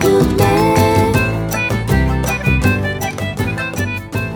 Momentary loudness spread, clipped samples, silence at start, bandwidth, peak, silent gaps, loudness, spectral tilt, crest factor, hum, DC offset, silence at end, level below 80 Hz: 8 LU; under 0.1%; 0 s; over 20 kHz; 0 dBFS; none; -15 LUFS; -6 dB/octave; 14 dB; none; under 0.1%; 0 s; -26 dBFS